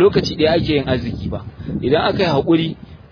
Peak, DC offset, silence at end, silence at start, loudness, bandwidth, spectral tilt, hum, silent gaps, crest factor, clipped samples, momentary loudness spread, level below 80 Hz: -2 dBFS; under 0.1%; 0.05 s; 0 s; -18 LUFS; 5.4 kHz; -7 dB/octave; none; none; 14 dB; under 0.1%; 12 LU; -38 dBFS